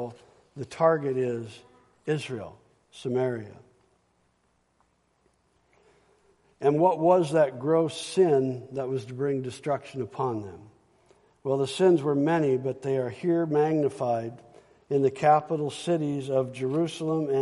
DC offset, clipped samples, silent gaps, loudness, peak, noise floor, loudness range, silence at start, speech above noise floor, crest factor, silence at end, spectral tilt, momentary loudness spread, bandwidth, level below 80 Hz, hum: under 0.1%; under 0.1%; none; -26 LUFS; -8 dBFS; -70 dBFS; 10 LU; 0 s; 44 dB; 20 dB; 0 s; -7 dB/octave; 15 LU; 11.5 kHz; -70 dBFS; none